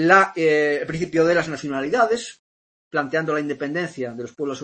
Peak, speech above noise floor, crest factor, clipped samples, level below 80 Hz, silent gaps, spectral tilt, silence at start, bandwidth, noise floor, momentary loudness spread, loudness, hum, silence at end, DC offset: -2 dBFS; over 69 dB; 20 dB; under 0.1%; -60 dBFS; 2.39-2.91 s; -5 dB/octave; 0 s; 8.8 kHz; under -90 dBFS; 11 LU; -21 LUFS; none; 0 s; under 0.1%